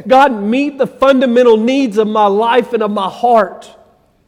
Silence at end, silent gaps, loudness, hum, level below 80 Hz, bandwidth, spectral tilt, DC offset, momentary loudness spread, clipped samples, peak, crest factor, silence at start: 0.6 s; none; -12 LUFS; none; -52 dBFS; 12.5 kHz; -6 dB/octave; under 0.1%; 7 LU; under 0.1%; 0 dBFS; 12 dB; 0.05 s